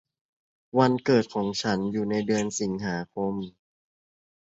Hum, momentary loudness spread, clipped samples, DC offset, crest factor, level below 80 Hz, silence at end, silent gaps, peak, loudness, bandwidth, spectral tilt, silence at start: none; 8 LU; under 0.1%; under 0.1%; 22 dB; -62 dBFS; 0.9 s; none; -6 dBFS; -26 LUFS; 8 kHz; -5.5 dB/octave; 0.75 s